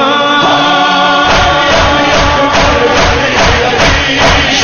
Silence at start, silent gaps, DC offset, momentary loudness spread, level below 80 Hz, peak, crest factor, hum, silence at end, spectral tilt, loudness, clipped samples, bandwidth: 0 s; none; under 0.1%; 1 LU; -22 dBFS; 0 dBFS; 8 dB; none; 0 s; -3.5 dB/octave; -7 LUFS; under 0.1%; 11 kHz